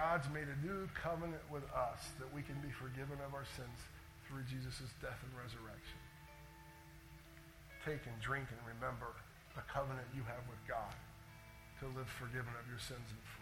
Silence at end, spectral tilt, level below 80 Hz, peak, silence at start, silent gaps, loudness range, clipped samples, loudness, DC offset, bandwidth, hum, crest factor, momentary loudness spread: 0 s; -5.5 dB/octave; -60 dBFS; -24 dBFS; 0 s; none; 6 LU; under 0.1%; -47 LUFS; under 0.1%; 17.5 kHz; none; 22 dB; 15 LU